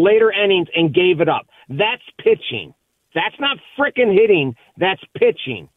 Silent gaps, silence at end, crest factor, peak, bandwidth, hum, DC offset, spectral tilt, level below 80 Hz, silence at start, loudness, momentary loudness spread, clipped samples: none; 0.1 s; 14 dB; -2 dBFS; 4 kHz; none; under 0.1%; -8 dB/octave; -58 dBFS; 0 s; -17 LUFS; 12 LU; under 0.1%